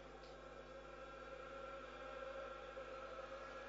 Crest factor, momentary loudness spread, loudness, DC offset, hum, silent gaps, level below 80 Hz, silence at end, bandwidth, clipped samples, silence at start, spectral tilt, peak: 14 dB; 6 LU; -53 LUFS; under 0.1%; 50 Hz at -65 dBFS; none; -66 dBFS; 0 s; 7.6 kHz; under 0.1%; 0 s; -2.5 dB/octave; -40 dBFS